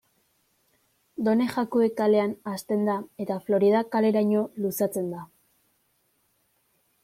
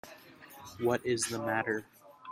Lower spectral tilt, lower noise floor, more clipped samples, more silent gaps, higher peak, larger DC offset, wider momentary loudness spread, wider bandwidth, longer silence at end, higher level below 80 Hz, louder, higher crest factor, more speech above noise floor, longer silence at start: first, -6.5 dB/octave vs -4 dB/octave; first, -70 dBFS vs -53 dBFS; neither; neither; first, -10 dBFS vs -16 dBFS; neither; second, 10 LU vs 21 LU; about the same, 16.5 kHz vs 16 kHz; first, 1.8 s vs 0 s; about the same, -72 dBFS vs -72 dBFS; first, -25 LUFS vs -33 LUFS; about the same, 16 dB vs 20 dB; first, 46 dB vs 21 dB; first, 1.2 s vs 0.05 s